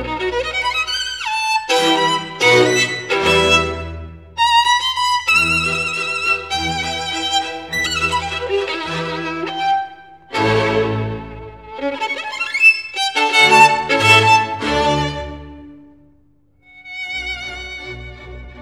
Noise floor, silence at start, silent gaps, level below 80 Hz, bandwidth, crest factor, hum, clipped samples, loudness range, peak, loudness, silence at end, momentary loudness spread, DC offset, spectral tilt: -56 dBFS; 0 s; none; -40 dBFS; 17 kHz; 18 dB; none; under 0.1%; 8 LU; 0 dBFS; -15 LUFS; 0 s; 18 LU; 0.2%; -3 dB/octave